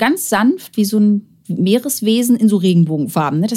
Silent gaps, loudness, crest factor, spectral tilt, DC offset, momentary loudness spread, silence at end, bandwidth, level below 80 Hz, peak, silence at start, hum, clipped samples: none; -15 LUFS; 14 dB; -5.5 dB/octave; under 0.1%; 6 LU; 0 s; 16 kHz; -64 dBFS; -2 dBFS; 0 s; none; under 0.1%